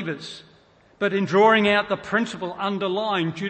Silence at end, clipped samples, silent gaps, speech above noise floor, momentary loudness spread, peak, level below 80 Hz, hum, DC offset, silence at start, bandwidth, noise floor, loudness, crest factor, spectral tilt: 0 s; under 0.1%; none; 33 dB; 16 LU; -6 dBFS; -62 dBFS; none; under 0.1%; 0 s; 8.8 kHz; -55 dBFS; -22 LUFS; 18 dB; -5.5 dB/octave